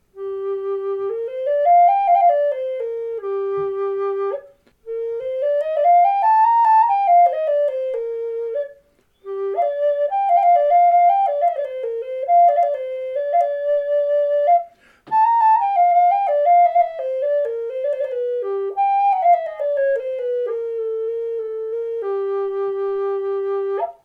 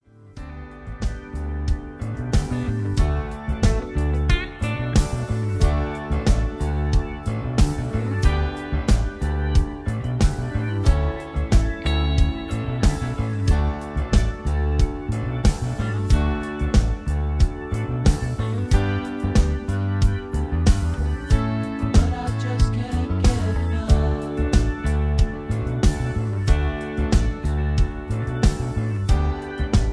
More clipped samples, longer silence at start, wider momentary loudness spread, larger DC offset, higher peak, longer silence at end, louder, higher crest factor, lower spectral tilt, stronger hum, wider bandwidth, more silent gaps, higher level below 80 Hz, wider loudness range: neither; about the same, 0.15 s vs 0.25 s; first, 11 LU vs 6 LU; neither; about the same, -6 dBFS vs -4 dBFS; first, 0.15 s vs 0 s; first, -19 LUFS vs -23 LUFS; second, 12 dB vs 18 dB; about the same, -5.5 dB/octave vs -6.5 dB/octave; neither; second, 4.7 kHz vs 11 kHz; neither; second, -68 dBFS vs -24 dBFS; first, 7 LU vs 1 LU